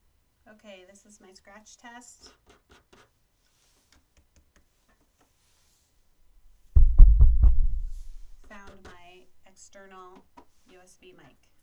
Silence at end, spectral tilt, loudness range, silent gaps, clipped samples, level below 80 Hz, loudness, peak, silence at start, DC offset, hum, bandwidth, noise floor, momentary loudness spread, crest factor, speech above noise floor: 3.5 s; -7 dB/octave; 14 LU; none; under 0.1%; -26 dBFS; -23 LUFS; 0 dBFS; 6.75 s; under 0.1%; none; 7.6 kHz; -68 dBFS; 31 LU; 24 dB; 18 dB